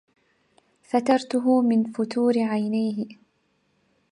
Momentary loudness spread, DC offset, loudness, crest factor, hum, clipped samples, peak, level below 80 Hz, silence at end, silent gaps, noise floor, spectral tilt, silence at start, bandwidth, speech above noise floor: 7 LU; under 0.1%; -23 LUFS; 18 dB; none; under 0.1%; -8 dBFS; -76 dBFS; 1 s; none; -69 dBFS; -6.5 dB/octave; 0.95 s; 11 kHz; 47 dB